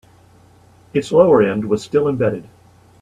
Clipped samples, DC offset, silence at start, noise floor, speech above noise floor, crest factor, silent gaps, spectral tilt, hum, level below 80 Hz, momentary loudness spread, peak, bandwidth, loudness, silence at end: under 0.1%; under 0.1%; 0.95 s; -49 dBFS; 33 dB; 18 dB; none; -7 dB/octave; none; -54 dBFS; 11 LU; 0 dBFS; 11 kHz; -16 LUFS; 0.6 s